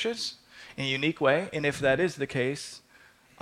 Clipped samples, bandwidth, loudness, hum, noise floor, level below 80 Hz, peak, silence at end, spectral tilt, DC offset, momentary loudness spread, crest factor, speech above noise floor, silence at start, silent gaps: under 0.1%; 15 kHz; -28 LUFS; none; -58 dBFS; -60 dBFS; -12 dBFS; 0.65 s; -4.5 dB/octave; under 0.1%; 17 LU; 18 dB; 30 dB; 0 s; none